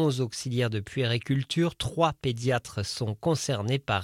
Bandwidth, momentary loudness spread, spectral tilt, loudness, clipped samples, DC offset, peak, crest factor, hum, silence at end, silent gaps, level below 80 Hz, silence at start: 15.5 kHz; 4 LU; -5.5 dB/octave; -28 LUFS; under 0.1%; under 0.1%; -10 dBFS; 18 dB; none; 0 s; none; -54 dBFS; 0 s